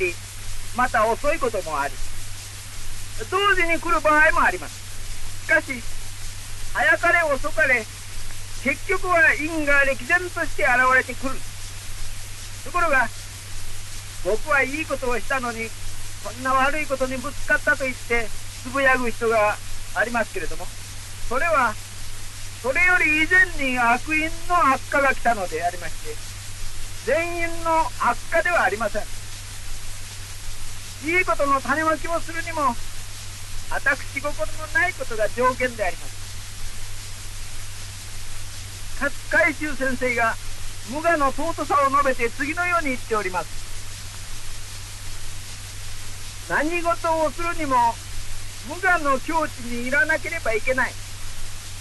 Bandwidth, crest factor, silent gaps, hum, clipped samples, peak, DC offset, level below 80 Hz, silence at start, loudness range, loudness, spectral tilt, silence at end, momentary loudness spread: 12 kHz; 16 dB; none; none; under 0.1%; -6 dBFS; under 0.1%; -34 dBFS; 0 s; 7 LU; -22 LUFS; -3.5 dB/octave; 0 s; 17 LU